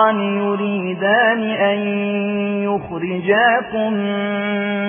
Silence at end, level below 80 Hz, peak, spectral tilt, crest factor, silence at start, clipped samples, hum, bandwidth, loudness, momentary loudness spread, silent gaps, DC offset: 0 s; -58 dBFS; -2 dBFS; -9.5 dB/octave; 16 dB; 0 s; under 0.1%; none; 3.6 kHz; -18 LUFS; 7 LU; none; under 0.1%